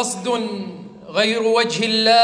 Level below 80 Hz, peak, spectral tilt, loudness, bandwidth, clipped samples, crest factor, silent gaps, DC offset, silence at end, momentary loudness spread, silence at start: -68 dBFS; -4 dBFS; -3 dB/octave; -19 LUFS; 10.5 kHz; under 0.1%; 14 dB; none; under 0.1%; 0 s; 14 LU; 0 s